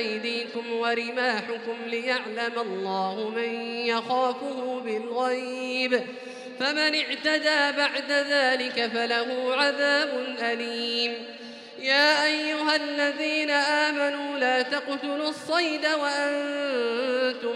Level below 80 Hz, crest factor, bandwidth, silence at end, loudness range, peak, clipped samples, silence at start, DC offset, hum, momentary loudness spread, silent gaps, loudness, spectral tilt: under -90 dBFS; 18 dB; 12.5 kHz; 0 s; 5 LU; -8 dBFS; under 0.1%; 0 s; under 0.1%; none; 8 LU; none; -25 LUFS; -2.5 dB/octave